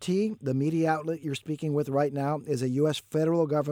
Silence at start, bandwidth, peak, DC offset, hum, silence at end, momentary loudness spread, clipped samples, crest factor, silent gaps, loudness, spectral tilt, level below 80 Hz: 0 s; 16.5 kHz; -14 dBFS; under 0.1%; none; 0 s; 6 LU; under 0.1%; 14 dB; none; -28 LUFS; -7 dB/octave; -72 dBFS